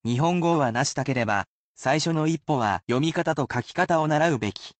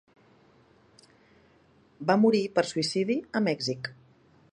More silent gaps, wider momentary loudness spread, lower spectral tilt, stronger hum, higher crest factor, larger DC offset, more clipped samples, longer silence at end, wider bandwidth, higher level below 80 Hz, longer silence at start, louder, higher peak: first, 1.47-1.75 s vs none; second, 6 LU vs 11 LU; about the same, -5.5 dB/octave vs -5 dB/octave; neither; second, 14 dB vs 22 dB; neither; neither; second, 0.1 s vs 0.6 s; second, 9 kHz vs 10.5 kHz; first, -60 dBFS vs -72 dBFS; second, 0.05 s vs 2 s; first, -24 LUFS vs -27 LUFS; about the same, -10 dBFS vs -8 dBFS